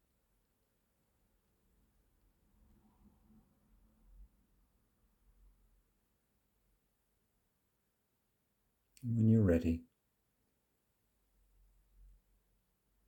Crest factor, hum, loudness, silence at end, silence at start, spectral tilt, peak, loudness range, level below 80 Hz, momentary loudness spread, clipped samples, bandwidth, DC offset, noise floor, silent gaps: 24 dB; none; -33 LUFS; 3.25 s; 4.2 s; -10 dB/octave; -20 dBFS; 8 LU; -64 dBFS; 13 LU; under 0.1%; 17.5 kHz; under 0.1%; -82 dBFS; none